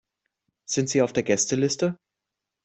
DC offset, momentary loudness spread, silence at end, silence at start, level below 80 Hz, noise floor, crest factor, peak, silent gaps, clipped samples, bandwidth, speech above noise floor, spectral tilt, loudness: under 0.1%; 12 LU; 0.7 s; 0.7 s; -64 dBFS; -85 dBFS; 20 dB; -6 dBFS; none; under 0.1%; 8.4 kHz; 62 dB; -4 dB/octave; -24 LUFS